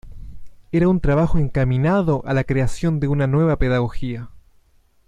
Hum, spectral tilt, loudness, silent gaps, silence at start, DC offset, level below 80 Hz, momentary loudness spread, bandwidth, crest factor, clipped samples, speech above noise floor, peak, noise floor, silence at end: none; -8.5 dB/octave; -20 LUFS; none; 0.05 s; under 0.1%; -32 dBFS; 7 LU; 10.5 kHz; 14 dB; under 0.1%; 38 dB; -6 dBFS; -56 dBFS; 0.7 s